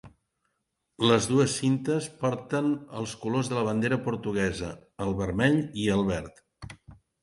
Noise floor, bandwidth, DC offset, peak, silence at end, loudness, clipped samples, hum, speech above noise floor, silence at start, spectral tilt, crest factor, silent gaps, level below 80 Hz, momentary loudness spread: -79 dBFS; 11.5 kHz; under 0.1%; -6 dBFS; 0.3 s; -27 LUFS; under 0.1%; none; 53 dB; 0.05 s; -5.5 dB/octave; 22 dB; none; -52 dBFS; 13 LU